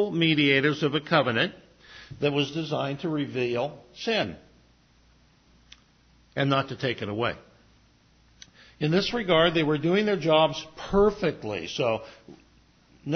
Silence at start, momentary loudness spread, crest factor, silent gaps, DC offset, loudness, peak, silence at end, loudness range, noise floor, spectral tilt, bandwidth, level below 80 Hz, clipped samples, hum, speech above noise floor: 0 s; 12 LU; 20 dB; none; under 0.1%; -25 LUFS; -6 dBFS; 0 s; 8 LU; -60 dBFS; -6 dB/octave; 6.6 kHz; -54 dBFS; under 0.1%; none; 35 dB